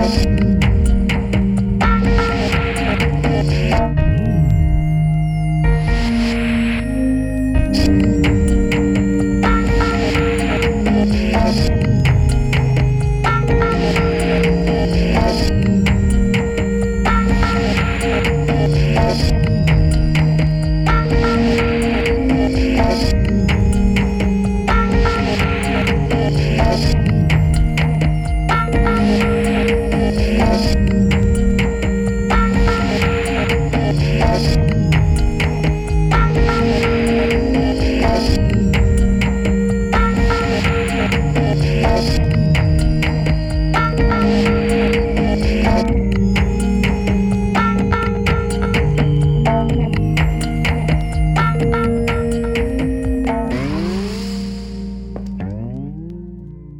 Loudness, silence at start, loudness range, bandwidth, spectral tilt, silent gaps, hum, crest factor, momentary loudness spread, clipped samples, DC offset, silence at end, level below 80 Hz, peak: -16 LUFS; 0 s; 1 LU; 13 kHz; -7 dB/octave; none; none; 14 dB; 3 LU; under 0.1%; under 0.1%; 0 s; -20 dBFS; 0 dBFS